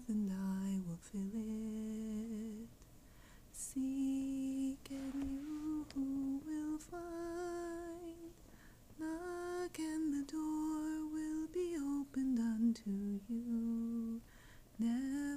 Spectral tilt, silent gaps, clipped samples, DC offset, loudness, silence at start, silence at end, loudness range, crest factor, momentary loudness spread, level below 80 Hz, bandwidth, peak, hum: -6 dB/octave; none; under 0.1%; under 0.1%; -41 LUFS; 0 s; 0 s; 5 LU; 14 dB; 11 LU; -62 dBFS; 15.5 kHz; -26 dBFS; none